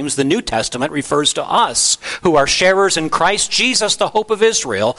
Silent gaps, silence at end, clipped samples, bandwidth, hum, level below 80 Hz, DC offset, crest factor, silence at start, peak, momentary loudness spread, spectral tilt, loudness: none; 0.05 s; under 0.1%; 11.5 kHz; none; -44 dBFS; under 0.1%; 14 dB; 0 s; -2 dBFS; 5 LU; -2 dB/octave; -15 LUFS